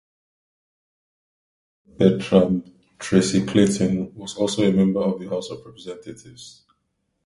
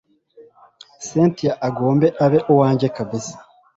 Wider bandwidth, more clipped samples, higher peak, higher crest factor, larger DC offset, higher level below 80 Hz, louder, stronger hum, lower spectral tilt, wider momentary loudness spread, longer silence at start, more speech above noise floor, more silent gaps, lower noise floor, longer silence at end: first, 11.5 kHz vs 8 kHz; neither; about the same, 0 dBFS vs -2 dBFS; about the same, 22 dB vs 18 dB; neither; about the same, -52 dBFS vs -56 dBFS; second, -21 LUFS vs -18 LUFS; neither; about the same, -6 dB/octave vs -7 dB/octave; first, 19 LU vs 13 LU; first, 2 s vs 0.4 s; first, 53 dB vs 31 dB; neither; first, -73 dBFS vs -49 dBFS; first, 0.75 s vs 0.35 s